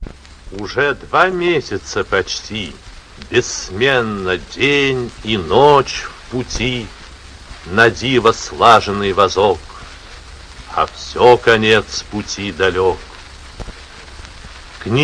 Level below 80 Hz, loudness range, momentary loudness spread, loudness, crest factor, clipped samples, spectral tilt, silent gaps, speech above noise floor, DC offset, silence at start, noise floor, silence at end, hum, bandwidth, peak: -36 dBFS; 4 LU; 24 LU; -15 LUFS; 16 dB; 0.3%; -4 dB/octave; none; 21 dB; under 0.1%; 0 s; -36 dBFS; 0 s; none; 11 kHz; 0 dBFS